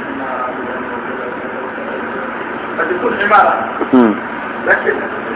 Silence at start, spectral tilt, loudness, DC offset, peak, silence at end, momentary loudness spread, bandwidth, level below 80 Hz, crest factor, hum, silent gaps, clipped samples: 0 s; -9 dB/octave; -16 LUFS; under 0.1%; 0 dBFS; 0 s; 12 LU; 4 kHz; -50 dBFS; 16 dB; none; none; under 0.1%